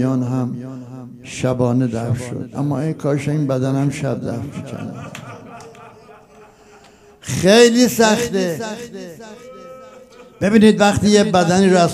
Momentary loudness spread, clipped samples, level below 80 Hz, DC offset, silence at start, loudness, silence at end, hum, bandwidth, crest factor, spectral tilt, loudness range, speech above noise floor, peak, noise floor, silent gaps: 23 LU; under 0.1%; -52 dBFS; under 0.1%; 0 s; -16 LUFS; 0 s; none; 15.5 kHz; 18 dB; -5.5 dB/octave; 9 LU; 30 dB; 0 dBFS; -46 dBFS; none